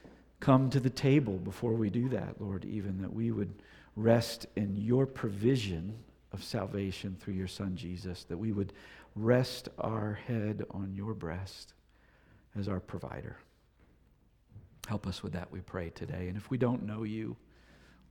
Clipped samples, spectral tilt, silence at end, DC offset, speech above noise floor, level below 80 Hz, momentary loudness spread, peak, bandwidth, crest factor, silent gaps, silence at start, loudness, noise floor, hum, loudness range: under 0.1%; -7 dB/octave; 0.75 s; under 0.1%; 33 dB; -58 dBFS; 16 LU; -10 dBFS; 17.5 kHz; 24 dB; none; 0.05 s; -34 LUFS; -66 dBFS; none; 10 LU